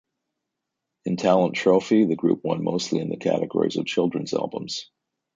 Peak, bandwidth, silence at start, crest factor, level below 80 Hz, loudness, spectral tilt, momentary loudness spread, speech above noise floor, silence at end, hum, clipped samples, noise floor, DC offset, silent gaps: -6 dBFS; 9.2 kHz; 1.05 s; 18 dB; -66 dBFS; -23 LUFS; -6 dB/octave; 10 LU; 60 dB; 0.5 s; none; under 0.1%; -83 dBFS; under 0.1%; none